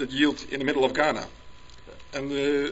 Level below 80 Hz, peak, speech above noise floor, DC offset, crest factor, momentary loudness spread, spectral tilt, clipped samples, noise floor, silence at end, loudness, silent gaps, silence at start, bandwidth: -52 dBFS; -8 dBFS; 21 dB; 0.4%; 20 dB; 12 LU; -4.5 dB/octave; under 0.1%; -46 dBFS; 0 s; -26 LUFS; none; 0 s; 8 kHz